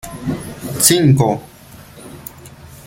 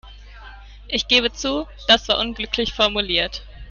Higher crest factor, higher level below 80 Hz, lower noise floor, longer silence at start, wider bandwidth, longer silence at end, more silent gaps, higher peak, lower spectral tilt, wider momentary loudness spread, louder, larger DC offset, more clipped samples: about the same, 18 dB vs 20 dB; second, -44 dBFS vs -38 dBFS; about the same, -39 dBFS vs -40 dBFS; about the same, 0.05 s vs 0.05 s; first, 17 kHz vs 13 kHz; about the same, 0.05 s vs 0 s; neither; about the same, 0 dBFS vs -2 dBFS; first, -4.5 dB/octave vs -2.5 dB/octave; first, 24 LU vs 9 LU; first, -15 LUFS vs -19 LUFS; neither; neither